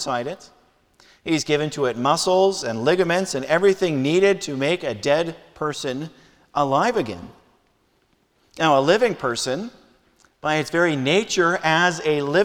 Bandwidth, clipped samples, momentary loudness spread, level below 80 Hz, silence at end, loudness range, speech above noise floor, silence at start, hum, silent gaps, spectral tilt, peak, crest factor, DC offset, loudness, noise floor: 17 kHz; under 0.1%; 11 LU; -58 dBFS; 0 s; 5 LU; 43 dB; 0 s; none; none; -4.5 dB/octave; -4 dBFS; 18 dB; under 0.1%; -21 LUFS; -64 dBFS